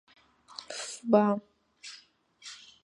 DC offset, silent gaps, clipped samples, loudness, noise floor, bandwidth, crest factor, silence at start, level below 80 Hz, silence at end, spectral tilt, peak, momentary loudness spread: under 0.1%; none; under 0.1%; -29 LUFS; -59 dBFS; 11.5 kHz; 24 dB; 0.6 s; -82 dBFS; 0.3 s; -5 dB/octave; -8 dBFS; 23 LU